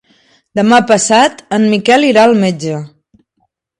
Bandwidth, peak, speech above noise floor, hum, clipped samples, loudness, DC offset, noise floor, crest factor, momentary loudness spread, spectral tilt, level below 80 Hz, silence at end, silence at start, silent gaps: 11.5 kHz; 0 dBFS; 54 dB; none; under 0.1%; -10 LUFS; under 0.1%; -64 dBFS; 12 dB; 12 LU; -4 dB/octave; -56 dBFS; 0.95 s; 0.55 s; none